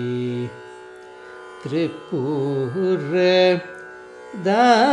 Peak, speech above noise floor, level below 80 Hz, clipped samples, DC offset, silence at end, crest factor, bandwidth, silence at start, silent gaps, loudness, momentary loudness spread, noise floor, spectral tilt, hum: -4 dBFS; 22 dB; -70 dBFS; under 0.1%; under 0.1%; 0 s; 16 dB; 10 kHz; 0 s; none; -20 LUFS; 24 LU; -40 dBFS; -6 dB/octave; none